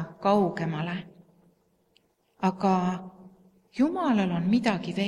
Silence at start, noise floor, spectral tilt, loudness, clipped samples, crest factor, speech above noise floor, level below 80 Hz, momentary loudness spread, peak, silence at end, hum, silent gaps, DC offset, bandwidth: 0 s; -68 dBFS; -7 dB/octave; -27 LUFS; under 0.1%; 18 dB; 42 dB; -66 dBFS; 13 LU; -10 dBFS; 0 s; none; none; under 0.1%; 10.5 kHz